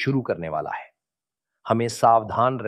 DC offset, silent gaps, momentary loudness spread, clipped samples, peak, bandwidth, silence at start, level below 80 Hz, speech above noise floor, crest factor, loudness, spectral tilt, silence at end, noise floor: under 0.1%; none; 15 LU; under 0.1%; -4 dBFS; 14 kHz; 0 s; -60 dBFS; 67 dB; 20 dB; -23 LUFS; -6 dB/octave; 0 s; -89 dBFS